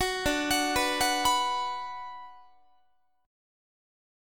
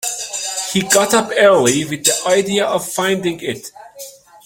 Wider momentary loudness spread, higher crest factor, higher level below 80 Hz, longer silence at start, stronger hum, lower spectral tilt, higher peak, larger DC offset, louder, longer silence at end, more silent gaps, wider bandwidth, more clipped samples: second, 15 LU vs 22 LU; about the same, 20 dB vs 16 dB; first, -52 dBFS vs -58 dBFS; about the same, 0 s vs 0 s; neither; about the same, -1.5 dB/octave vs -2.5 dB/octave; second, -12 dBFS vs 0 dBFS; first, 0.3% vs under 0.1%; second, -27 LUFS vs -15 LUFS; first, 1 s vs 0.35 s; neither; first, 19.5 kHz vs 17 kHz; neither